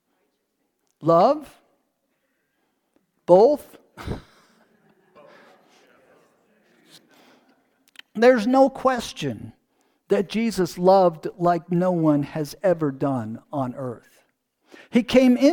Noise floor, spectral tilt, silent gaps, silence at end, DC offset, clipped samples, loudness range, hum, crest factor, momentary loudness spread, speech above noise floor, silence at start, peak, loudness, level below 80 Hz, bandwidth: -73 dBFS; -6.5 dB/octave; none; 0 s; under 0.1%; under 0.1%; 5 LU; none; 22 dB; 18 LU; 54 dB; 1 s; -2 dBFS; -21 LUFS; -54 dBFS; 18.5 kHz